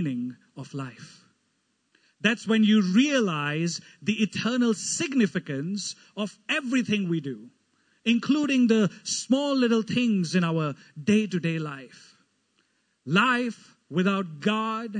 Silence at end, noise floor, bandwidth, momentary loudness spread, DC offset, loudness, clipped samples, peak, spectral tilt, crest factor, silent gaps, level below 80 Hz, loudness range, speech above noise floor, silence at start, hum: 0 s; -73 dBFS; 9.6 kHz; 14 LU; under 0.1%; -25 LUFS; under 0.1%; -6 dBFS; -5 dB/octave; 20 dB; none; -76 dBFS; 4 LU; 47 dB; 0 s; none